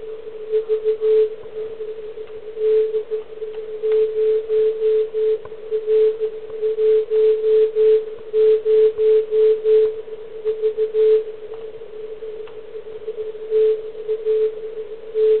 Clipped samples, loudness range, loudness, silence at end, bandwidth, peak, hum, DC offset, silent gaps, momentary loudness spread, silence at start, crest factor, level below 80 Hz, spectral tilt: under 0.1%; 7 LU; -19 LUFS; 0 s; 4.2 kHz; -8 dBFS; none; 1%; none; 17 LU; 0 s; 12 dB; -62 dBFS; -8.5 dB/octave